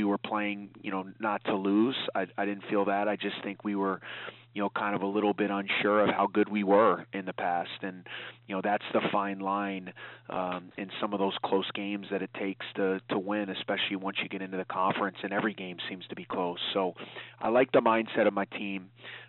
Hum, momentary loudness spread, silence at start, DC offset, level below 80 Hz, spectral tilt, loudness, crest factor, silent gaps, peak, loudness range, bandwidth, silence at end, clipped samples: none; 13 LU; 0 s; under 0.1%; -78 dBFS; -3 dB/octave; -30 LUFS; 20 dB; none; -10 dBFS; 5 LU; 4.3 kHz; 0 s; under 0.1%